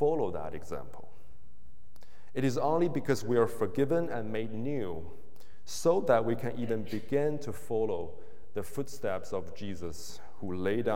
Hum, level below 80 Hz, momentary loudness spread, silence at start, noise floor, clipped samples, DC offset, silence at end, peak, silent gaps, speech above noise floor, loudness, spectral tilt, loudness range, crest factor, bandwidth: none; -60 dBFS; 14 LU; 0 s; -60 dBFS; under 0.1%; 2%; 0 s; -12 dBFS; none; 28 dB; -33 LUFS; -6.5 dB/octave; 4 LU; 20 dB; 16.5 kHz